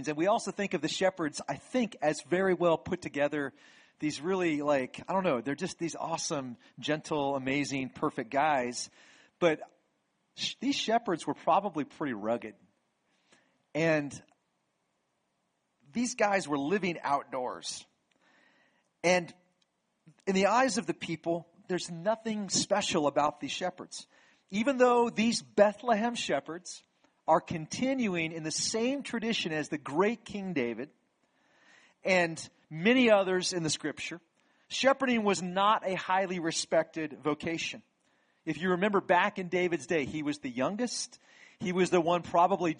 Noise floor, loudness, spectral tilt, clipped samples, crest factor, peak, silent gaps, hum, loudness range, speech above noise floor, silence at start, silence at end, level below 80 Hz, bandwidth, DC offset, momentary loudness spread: -78 dBFS; -30 LUFS; -4 dB/octave; under 0.1%; 22 dB; -10 dBFS; none; none; 5 LU; 48 dB; 0 s; 0.05 s; -72 dBFS; 10 kHz; under 0.1%; 12 LU